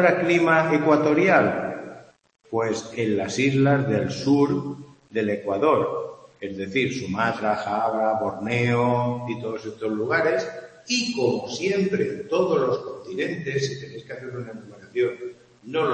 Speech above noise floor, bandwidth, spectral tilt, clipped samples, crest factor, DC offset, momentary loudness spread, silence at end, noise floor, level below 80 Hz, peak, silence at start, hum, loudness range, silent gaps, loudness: 21 dB; 8.8 kHz; -5.5 dB/octave; under 0.1%; 20 dB; under 0.1%; 16 LU; 0 s; -44 dBFS; -64 dBFS; -2 dBFS; 0 s; none; 4 LU; none; -23 LUFS